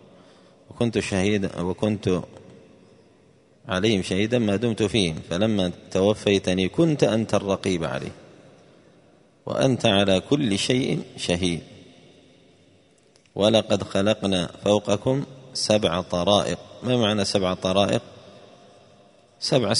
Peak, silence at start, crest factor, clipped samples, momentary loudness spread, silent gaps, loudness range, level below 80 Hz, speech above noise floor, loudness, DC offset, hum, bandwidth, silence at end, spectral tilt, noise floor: -2 dBFS; 0.7 s; 22 dB; under 0.1%; 8 LU; none; 4 LU; -54 dBFS; 36 dB; -23 LUFS; under 0.1%; none; 11 kHz; 0 s; -5 dB/octave; -58 dBFS